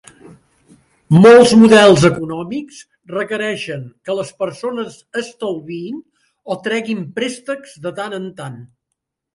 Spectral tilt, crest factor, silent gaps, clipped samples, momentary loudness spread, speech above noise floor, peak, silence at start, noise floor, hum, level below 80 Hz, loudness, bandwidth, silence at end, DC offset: -5.5 dB/octave; 16 dB; none; under 0.1%; 20 LU; 63 dB; 0 dBFS; 1.1 s; -77 dBFS; none; -52 dBFS; -14 LUFS; 11.5 kHz; 0.7 s; under 0.1%